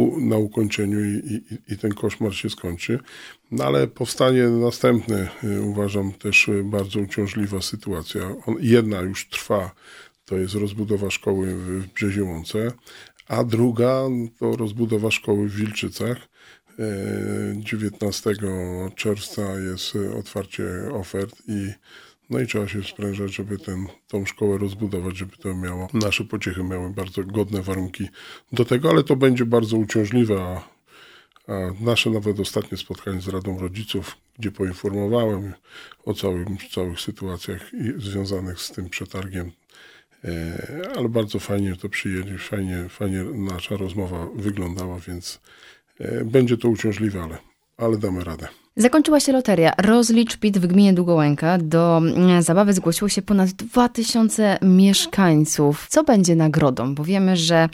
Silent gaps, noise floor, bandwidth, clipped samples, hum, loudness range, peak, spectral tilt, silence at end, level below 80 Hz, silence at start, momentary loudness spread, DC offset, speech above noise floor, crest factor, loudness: none; -50 dBFS; 16.5 kHz; under 0.1%; none; 11 LU; -2 dBFS; -5.5 dB/octave; 0 s; -50 dBFS; 0 s; 14 LU; under 0.1%; 29 dB; 20 dB; -22 LUFS